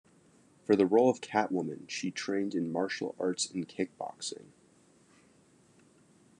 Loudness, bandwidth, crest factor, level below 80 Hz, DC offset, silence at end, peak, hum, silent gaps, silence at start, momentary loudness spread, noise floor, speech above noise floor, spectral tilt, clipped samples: -32 LUFS; 10.5 kHz; 22 dB; -82 dBFS; under 0.1%; 2 s; -12 dBFS; none; none; 0.7 s; 13 LU; -64 dBFS; 33 dB; -4.5 dB/octave; under 0.1%